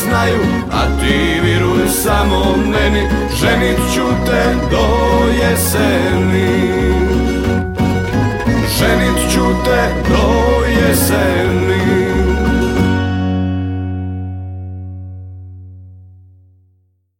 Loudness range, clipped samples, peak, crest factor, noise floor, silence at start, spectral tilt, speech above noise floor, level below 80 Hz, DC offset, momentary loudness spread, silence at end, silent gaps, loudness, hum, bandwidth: 7 LU; under 0.1%; 0 dBFS; 14 dB; -57 dBFS; 0 s; -5.5 dB/octave; 45 dB; -22 dBFS; under 0.1%; 10 LU; 1.15 s; none; -14 LUFS; none; 17 kHz